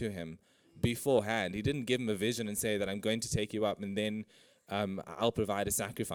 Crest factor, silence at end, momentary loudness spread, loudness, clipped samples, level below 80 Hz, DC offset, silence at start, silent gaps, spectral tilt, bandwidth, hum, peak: 20 dB; 0 s; 8 LU; -34 LUFS; under 0.1%; -58 dBFS; under 0.1%; 0 s; none; -4.5 dB/octave; 19.5 kHz; none; -14 dBFS